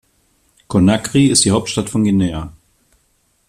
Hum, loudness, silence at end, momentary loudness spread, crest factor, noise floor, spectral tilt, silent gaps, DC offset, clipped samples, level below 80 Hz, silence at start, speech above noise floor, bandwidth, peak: none; -15 LUFS; 1 s; 10 LU; 18 dB; -61 dBFS; -4.5 dB/octave; none; under 0.1%; under 0.1%; -44 dBFS; 0.7 s; 47 dB; 14 kHz; 0 dBFS